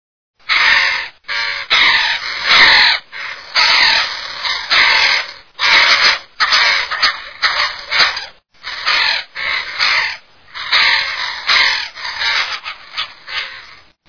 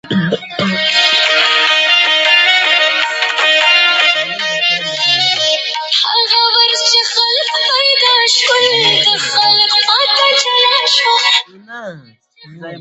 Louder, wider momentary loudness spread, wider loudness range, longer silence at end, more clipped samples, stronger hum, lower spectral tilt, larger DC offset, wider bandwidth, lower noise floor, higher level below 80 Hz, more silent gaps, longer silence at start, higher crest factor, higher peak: second, -12 LUFS vs -9 LUFS; first, 15 LU vs 6 LU; about the same, 4 LU vs 2 LU; first, 0.35 s vs 0 s; neither; neither; second, 1 dB/octave vs -1.5 dB/octave; first, 0.4% vs under 0.1%; second, 5.4 kHz vs 9 kHz; about the same, -40 dBFS vs -42 dBFS; first, -48 dBFS vs -64 dBFS; neither; first, 0.5 s vs 0.05 s; about the same, 16 dB vs 12 dB; about the same, 0 dBFS vs 0 dBFS